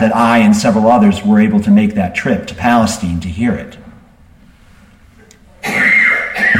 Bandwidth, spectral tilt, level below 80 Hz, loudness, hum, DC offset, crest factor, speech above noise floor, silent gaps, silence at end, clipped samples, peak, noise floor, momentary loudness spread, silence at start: 14.5 kHz; -5.5 dB/octave; -40 dBFS; -11 LUFS; none; under 0.1%; 12 dB; 32 dB; none; 0 s; under 0.1%; 0 dBFS; -43 dBFS; 9 LU; 0 s